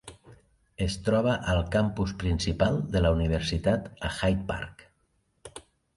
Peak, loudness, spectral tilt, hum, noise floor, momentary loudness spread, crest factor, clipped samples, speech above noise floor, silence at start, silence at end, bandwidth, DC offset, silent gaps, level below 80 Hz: -10 dBFS; -28 LUFS; -6 dB/octave; none; -71 dBFS; 18 LU; 18 dB; under 0.1%; 45 dB; 0.05 s; 0.35 s; 11.5 kHz; under 0.1%; none; -38 dBFS